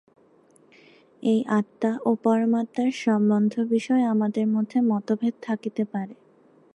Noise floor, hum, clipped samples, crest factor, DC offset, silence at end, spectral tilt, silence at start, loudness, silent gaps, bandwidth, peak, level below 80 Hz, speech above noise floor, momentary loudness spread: -58 dBFS; none; under 0.1%; 16 dB; under 0.1%; 0.65 s; -7.5 dB/octave; 1.2 s; -24 LUFS; none; 8.8 kHz; -8 dBFS; -78 dBFS; 35 dB; 8 LU